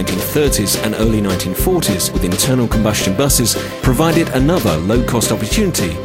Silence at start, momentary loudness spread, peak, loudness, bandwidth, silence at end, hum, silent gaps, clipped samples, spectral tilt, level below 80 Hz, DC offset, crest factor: 0 s; 3 LU; 0 dBFS; -15 LUFS; 16.5 kHz; 0 s; none; none; under 0.1%; -4.5 dB/octave; -26 dBFS; 0.2%; 14 dB